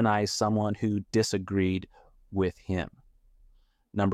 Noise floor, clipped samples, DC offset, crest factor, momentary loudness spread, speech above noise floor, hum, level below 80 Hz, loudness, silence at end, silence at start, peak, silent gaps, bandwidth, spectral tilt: -61 dBFS; under 0.1%; under 0.1%; 18 dB; 9 LU; 34 dB; none; -56 dBFS; -29 LUFS; 0 s; 0 s; -12 dBFS; none; 15 kHz; -5.5 dB/octave